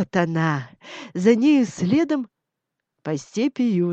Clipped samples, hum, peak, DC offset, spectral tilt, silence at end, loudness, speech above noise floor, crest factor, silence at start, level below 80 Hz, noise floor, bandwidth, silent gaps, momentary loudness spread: under 0.1%; none; -4 dBFS; under 0.1%; -6.5 dB/octave; 0 s; -21 LUFS; 61 dB; 16 dB; 0 s; -64 dBFS; -82 dBFS; 8.4 kHz; none; 18 LU